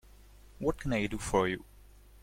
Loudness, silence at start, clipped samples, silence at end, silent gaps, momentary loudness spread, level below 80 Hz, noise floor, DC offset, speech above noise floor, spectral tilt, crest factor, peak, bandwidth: -33 LUFS; 0.5 s; under 0.1%; 0.25 s; none; 5 LU; -48 dBFS; -56 dBFS; under 0.1%; 24 dB; -5.5 dB/octave; 20 dB; -14 dBFS; 16.5 kHz